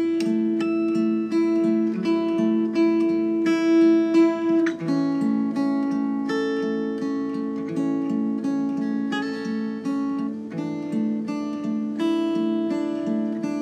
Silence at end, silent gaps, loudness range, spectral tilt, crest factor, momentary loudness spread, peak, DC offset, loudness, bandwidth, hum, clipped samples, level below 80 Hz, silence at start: 0 s; none; 6 LU; -7 dB/octave; 14 dB; 8 LU; -8 dBFS; under 0.1%; -23 LUFS; 8.8 kHz; none; under 0.1%; -88 dBFS; 0 s